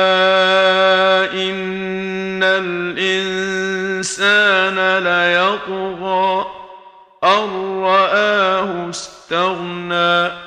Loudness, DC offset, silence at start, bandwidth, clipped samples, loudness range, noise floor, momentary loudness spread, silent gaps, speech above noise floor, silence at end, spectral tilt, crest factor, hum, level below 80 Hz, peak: -16 LUFS; under 0.1%; 0 s; 10.5 kHz; under 0.1%; 2 LU; -42 dBFS; 10 LU; none; 25 dB; 0 s; -3.5 dB/octave; 16 dB; none; -58 dBFS; 0 dBFS